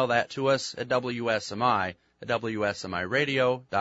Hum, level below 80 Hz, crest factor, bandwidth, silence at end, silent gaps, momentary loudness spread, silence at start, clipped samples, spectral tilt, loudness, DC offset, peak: none; -64 dBFS; 18 dB; 8 kHz; 0 s; none; 6 LU; 0 s; under 0.1%; -4.5 dB/octave; -27 LUFS; under 0.1%; -8 dBFS